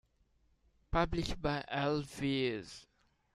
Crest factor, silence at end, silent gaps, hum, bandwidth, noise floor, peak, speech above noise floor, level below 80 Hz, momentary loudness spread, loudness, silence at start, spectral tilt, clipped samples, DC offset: 20 dB; 0.55 s; none; none; 13 kHz; -72 dBFS; -18 dBFS; 37 dB; -48 dBFS; 10 LU; -36 LUFS; 0.9 s; -5.5 dB/octave; under 0.1%; under 0.1%